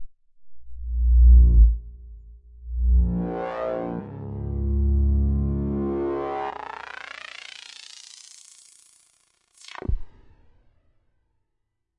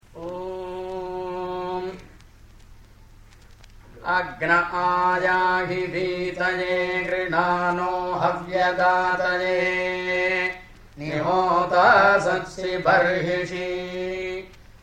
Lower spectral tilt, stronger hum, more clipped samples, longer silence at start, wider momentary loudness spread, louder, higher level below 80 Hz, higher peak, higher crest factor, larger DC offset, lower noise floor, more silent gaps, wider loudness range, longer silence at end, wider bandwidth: first, -8 dB/octave vs -5.5 dB/octave; neither; neither; second, 0 s vs 0.15 s; first, 24 LU vs 13 LU; about the same, -23 LUFS vs -22 LUFS; first, -24 dBFS vs -50 dBFS; about the same, -6 dBFS vs -4 dBFS; about the same, 18 dB vs 18 dB; neither; first, -76 dBFS vs -48 dBFS; neither; first, 19 LU vs 12 LU; first, 1.9 s vs 0.05 s; second, 8 kHz vs 10 kHz